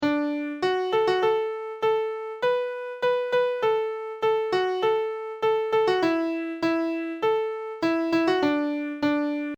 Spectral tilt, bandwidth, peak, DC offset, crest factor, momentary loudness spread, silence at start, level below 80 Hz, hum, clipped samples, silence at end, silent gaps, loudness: -5.5 dB/octave; 8.8 kHz; -10 dBFS; under 0.1%; 14 dB; 6 LU; 0 s; -68 dBFS; none; under 0.1%; 0 s; none; -25 LUFS